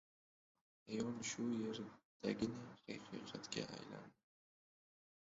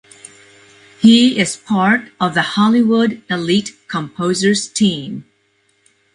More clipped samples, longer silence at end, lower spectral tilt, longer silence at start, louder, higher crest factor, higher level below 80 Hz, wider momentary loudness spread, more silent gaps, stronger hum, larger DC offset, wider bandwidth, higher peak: neither; first, 1.1 s vs 0.95 s; about the same, -4.5 dB/octave vs -4.5 dB/octave; second, 0.85 s vs 1 s; second, -46 LUFS vs -15 LUFS; first, 22 dB vs 16 dB; second, -78 dBFS vs -58 dBFS; about the same, 12 LU vs 13 LU; first, 2.05-2.20 s vs none; neither; neither; second, 7.6 kHz vs 11 kHz; second, -26 dBFS vs 0 dBFS